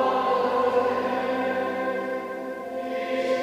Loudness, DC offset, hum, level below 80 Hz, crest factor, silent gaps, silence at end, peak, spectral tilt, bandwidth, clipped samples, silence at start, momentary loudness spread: -26 LUFS; under 0.1%; none; -66 dBFS; 14 dB; none; 0 s; -10 dBFS; -5 dB/octave; 15 kHz; under 0.1%; 0 s; 10 LU